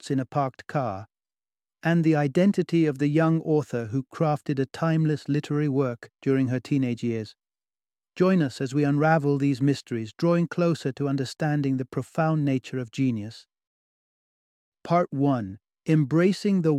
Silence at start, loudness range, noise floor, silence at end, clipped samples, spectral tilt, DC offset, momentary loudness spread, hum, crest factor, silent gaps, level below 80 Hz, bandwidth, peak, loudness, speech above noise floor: 0.05 s; 4 LU; under -90 dBFS; 0 s; under 0.1%; -8 dB/octave; under 0.1%; 9 LU; none; 18 dB; 13.67-14.72 s; -68 dBFS; 11.5 kHz; -6 dBFS; -25 LUFS; over 66 dB